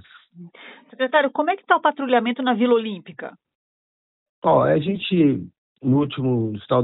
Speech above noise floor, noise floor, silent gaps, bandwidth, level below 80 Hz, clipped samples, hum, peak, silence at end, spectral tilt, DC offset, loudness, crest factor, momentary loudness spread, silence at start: 25 dB; -45 dBFS; 3.55-4.42 s, 5.58-5.76 s; 4.1 kHz; -60 dBFS; under 0.1%; none; -2 dBFS; 0 s; -11 dB/octave; under 0.1%; -20 LUFS; 20 dB; 15 LU; 0.35 s